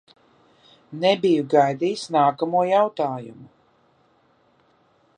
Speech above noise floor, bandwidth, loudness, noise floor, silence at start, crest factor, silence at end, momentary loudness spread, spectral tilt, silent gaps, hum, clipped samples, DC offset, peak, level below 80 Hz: 41 dB; 10 kHz; -21 LUFS; -61 dBFS; 0.9 s; 20 dB; 1.7 s; 12 LU; -6 dB/octave; none; none; under 0.1%; under 0.1%; -4 dBFS; -74 dBFS